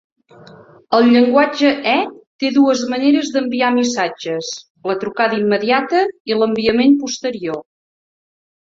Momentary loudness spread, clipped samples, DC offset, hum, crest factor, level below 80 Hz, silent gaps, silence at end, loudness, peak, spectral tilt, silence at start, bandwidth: 11 LU; under 0.1%; under 0.1%; none; 16 dB; -58 dBFS; 2.27-2.39 s, 4.70-4.75 s, 6.20-6.25 s; 1 s; -16 LUFS; -2 dBFS; -4 dB/octave; 0.9 s; 7.8 kHz